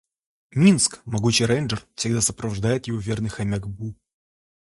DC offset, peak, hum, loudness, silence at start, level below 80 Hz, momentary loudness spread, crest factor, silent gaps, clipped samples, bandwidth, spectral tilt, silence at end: under 0.1%; -4 dBFS; none; -22 LUFS; 0.55 s; -48 dBFS; 12 LU; 18 dB; none; under 0.1%; 11.5 kHz; -4.5 dB/octave; 0.75 s